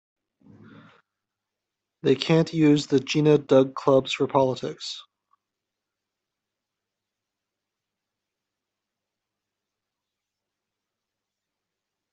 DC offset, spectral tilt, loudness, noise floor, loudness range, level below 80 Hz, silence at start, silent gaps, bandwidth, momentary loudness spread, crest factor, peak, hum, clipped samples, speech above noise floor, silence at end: under 0.1%; -6.5 dB/octave; -22 LUFS; -86 dBFS; 10 LU; -68 dBFS; 2.05 s; none; 8.2 kHz; 13 LU; 22 dB; -6 dBFS; none; under 0.1%; 65 dB; 7.1 s